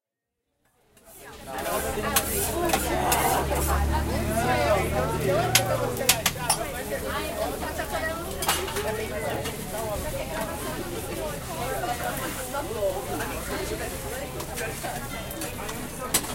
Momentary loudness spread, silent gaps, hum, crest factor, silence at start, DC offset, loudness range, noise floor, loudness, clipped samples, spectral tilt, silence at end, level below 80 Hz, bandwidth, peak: 10 LU; none; none; 26 dB; 1.05 s; under 0.1%; 7 LU; -83 dBFS; -27 LUFS; under 0.1%; -3.5 dB/octave; 0 s; -38 dBFS; 17 kHz; -2 dBFS